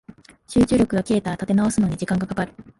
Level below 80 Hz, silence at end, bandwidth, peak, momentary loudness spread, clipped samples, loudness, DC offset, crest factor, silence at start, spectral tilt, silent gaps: -44 dBFS; 0.15 s; 11.5 kHz; -8 dBFS; 6 LU; under 0.1%; -21 LUFS; under 0.1%; 14 dB; 0.5 s; -6.5 dB/octave; none